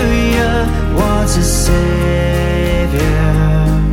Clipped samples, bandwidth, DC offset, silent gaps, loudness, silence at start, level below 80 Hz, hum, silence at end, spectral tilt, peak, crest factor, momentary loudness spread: under 0.1%; 16.5 kHz; under 0.1%; none; -14 LUFS; 0 s; -16 dBFS; none; 0 s; -5.5 dB/octave; 0 dBFS; 12 dB; 2 LU